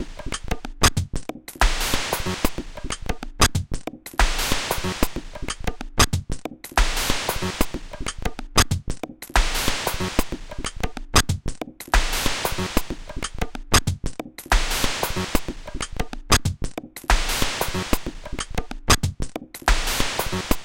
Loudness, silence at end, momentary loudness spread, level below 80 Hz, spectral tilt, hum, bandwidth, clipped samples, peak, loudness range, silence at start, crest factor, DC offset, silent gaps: -24 LUFS; 0 s; 13 LU; -28 dBFS; -3 dB/octave; none; 17 kHz; under 0.1%; -2 dBFS; 1 LU; 0 s; 20 dB; under 0.1%; none